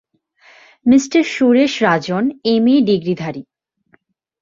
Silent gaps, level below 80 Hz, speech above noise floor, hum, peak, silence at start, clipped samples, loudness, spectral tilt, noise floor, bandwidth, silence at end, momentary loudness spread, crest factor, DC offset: none; -58 dBFS; 44 dB; none; -2 dBFS; 0.85 s; under 0.1%; -15 LUFS; -5.5 dB/octave; -58 dBFS; 7.6 kHz; 1 s; 9 LU; 16 dB; under 0.1%